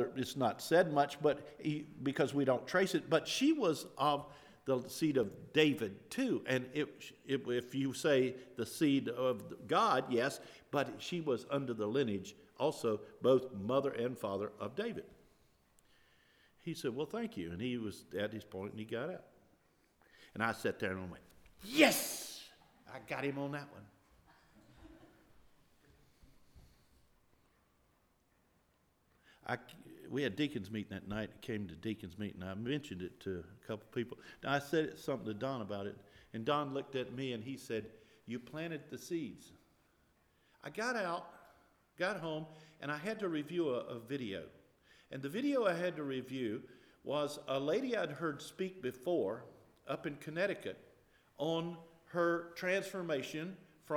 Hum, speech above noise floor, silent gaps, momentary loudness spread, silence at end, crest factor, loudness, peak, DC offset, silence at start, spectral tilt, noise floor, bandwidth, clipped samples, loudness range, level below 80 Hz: none; 37 dB; none; 15 LU; 0 s; 28 dB; -38 LUFS; -12 dBFS; under 0.1%; 0 s; -5 dB/octave; -74 dBFS; over 20 kHz; under 0.1%; 9 LU; -74 dBFS